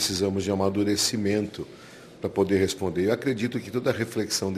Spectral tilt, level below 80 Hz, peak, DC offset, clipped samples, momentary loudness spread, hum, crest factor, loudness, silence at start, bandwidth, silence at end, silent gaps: -4.5 dB/octave; -62 dBFS; -10 dBFS; under 0.1%; under 0.1%; 12 LU; none; 16 dB; -26 LUFS; 0 s; 14 kHz; 0 s; none